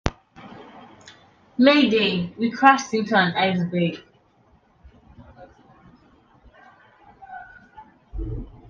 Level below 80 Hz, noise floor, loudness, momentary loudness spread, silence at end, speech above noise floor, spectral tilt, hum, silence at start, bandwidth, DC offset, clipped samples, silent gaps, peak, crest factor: -44 dBFS; -59 dBFS; -20 LUFS; 25 LU; 0.25 s; 40 dB; -5.5 dB/octave; none; 0.05 s; 7.4 kHz; under 0.1%; under 0.1%; none; 0 dBFS; 24 dB